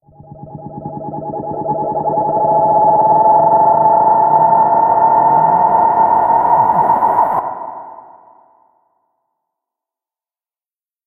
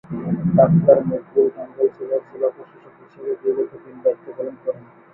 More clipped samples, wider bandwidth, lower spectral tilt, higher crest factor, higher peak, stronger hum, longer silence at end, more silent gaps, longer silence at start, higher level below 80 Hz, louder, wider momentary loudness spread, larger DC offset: neither; second, 2.4 kHz vs 2.9 kHz; second, -10 dB/octave vs -14 dB/octave; second, 14 dB vs 20 dB; about the same, 0 dBFS vs 0 dBFS; neither; first, 3.05 s vs 0.35 s; neither; first, 0.4 s vs 0.1 s; about the same, -52 dBFS vs -54 dBFS; first, -12 LUFS vs -20 LUFS; about the same, 16 LU vs 15 LU; neither